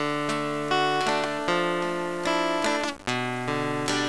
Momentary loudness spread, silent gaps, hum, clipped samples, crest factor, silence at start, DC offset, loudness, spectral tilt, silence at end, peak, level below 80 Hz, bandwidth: 4 LU; none; none; under 0.1%; 18 dB; 0 s; 0.5%; -26 LUFS; -4 dB/octave; 0 s; -8 dBFS; -60 dBFS; 11 kHz